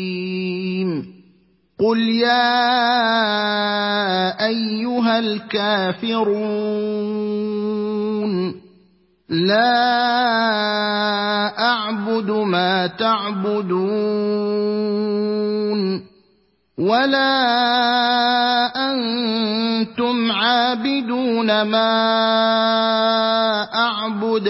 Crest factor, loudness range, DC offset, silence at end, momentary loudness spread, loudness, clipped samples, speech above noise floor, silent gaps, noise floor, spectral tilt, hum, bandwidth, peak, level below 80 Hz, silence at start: 16 dB; 4 LU; under 0.1%; 0 s; 7 LU; -18 LUFS; under 0.1%; 43 dB; none; -61 dBFS; -8.5 dB/octave; none; 5.8 kHz; -2 dBFS; -66 dBFS; 0 s